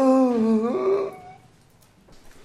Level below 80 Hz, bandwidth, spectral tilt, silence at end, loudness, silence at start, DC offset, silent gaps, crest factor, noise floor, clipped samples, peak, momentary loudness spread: -58 dBFS; 11 kHz; -7.5 dB/octave; 1.15 s; -22 LUFS; 0 s; under 0.1%; none; 14 dB; -55 dBFS; under 0.1%; -10 dBFS; 13 LU